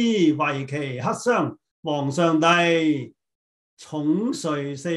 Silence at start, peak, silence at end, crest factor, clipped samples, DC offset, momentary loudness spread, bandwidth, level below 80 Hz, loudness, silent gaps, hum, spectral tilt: 0 s; -6 dBFS; 0 s; 18 dB; under 0.1%; under 0.1%; 11 LU; 12 kHz; -70 dBFS; -22 LUFS; 1.71-1.83 s, 3.35-3.77 s; none; -5.5 dB/octave